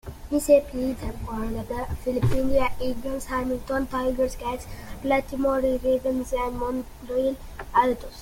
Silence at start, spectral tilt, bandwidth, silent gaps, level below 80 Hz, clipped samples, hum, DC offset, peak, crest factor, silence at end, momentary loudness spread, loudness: 0.05 s; -6 dB/octave; 17 kHz; none; -38 dBFS; under 0.1%; none; under 0.1%; -6 dBFS; 18 dB; 0 s; 10 LU; -26 LUFS